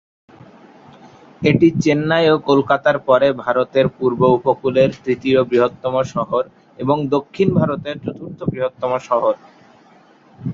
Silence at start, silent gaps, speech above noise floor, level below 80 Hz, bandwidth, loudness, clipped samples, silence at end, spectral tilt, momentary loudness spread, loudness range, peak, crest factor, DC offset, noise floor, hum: 1.4 s; none; 33 dB; -52 dBFS; 7.6 kHz; -17 LUFS; under 0.1%; 0 s; -7 dB/octave; 11 LU; 5 LU; -2 dBFS; 16 dB; under 0.1%; -49 dBFS; none